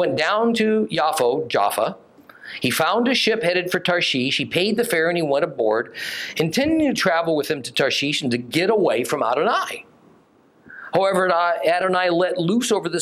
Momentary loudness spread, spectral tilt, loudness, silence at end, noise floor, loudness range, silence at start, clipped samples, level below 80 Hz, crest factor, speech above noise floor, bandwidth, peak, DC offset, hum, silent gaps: 5 LU; -4 dB/octave; -20 LUFS; 0 s; -55 dBFS; 2 LU; 0 s; under 0.1%; -62 dBFS; 16 dB; 35 dB; 16.5 kHz; -4 dBFS; under 0.1%; none; none